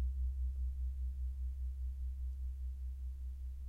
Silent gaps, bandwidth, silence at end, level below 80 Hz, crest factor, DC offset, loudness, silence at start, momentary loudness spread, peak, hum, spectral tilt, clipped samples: none; 0.5 kHz; 0 s; -40 dBFS; 10 dB; under 0.1%; -43 LUFS; 0 s; 5 LU; -30 dBFS; none; -8 dB/octave; under 0.1%